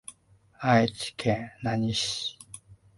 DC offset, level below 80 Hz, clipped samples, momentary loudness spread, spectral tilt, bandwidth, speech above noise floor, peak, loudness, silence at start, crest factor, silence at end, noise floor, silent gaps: under 0.1%; -56 dBFS; under 0.1%; 22 LU; -4.5 dB/octave; 11.5 kHz; 33 dB; -8 dBFS; -27 LUFS; 0.1 s; 22 dB; 0.25 s; -60 dBFS; none